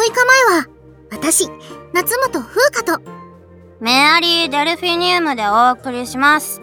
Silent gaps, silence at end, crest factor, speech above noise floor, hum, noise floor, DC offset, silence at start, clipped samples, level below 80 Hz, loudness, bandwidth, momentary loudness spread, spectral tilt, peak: none; 0 s; 16 dB; 26 dB; none; -42 dBFS; under 0.1%; 0 s; under 0.1%; -52 dBFS; -14 LUFS; over 20 kHz; 13 LU; -1.5 dB/octave; 0 dBFS